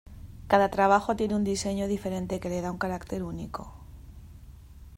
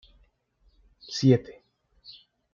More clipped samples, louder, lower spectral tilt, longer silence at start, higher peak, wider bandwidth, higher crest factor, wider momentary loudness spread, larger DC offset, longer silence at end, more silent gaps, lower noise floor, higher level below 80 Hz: neither; second, -28 LUFS vs -24 LUFS; second, -5.5 dB/octave vs -7 dB/octave; second, 0.05 s vs 1.1 s; about the same, -6 dBFS vs -8 dBFS; first, 16 kHz vs 7.4 kHz; about the same, 22 dB vs 22 dB; about the same, 25 LU vs 26 LU; neither; second, 0 s vs 1 s; neither; second, -48 dBFS vs -66 dBFS; first, -48 dBFS vs -62 dBFS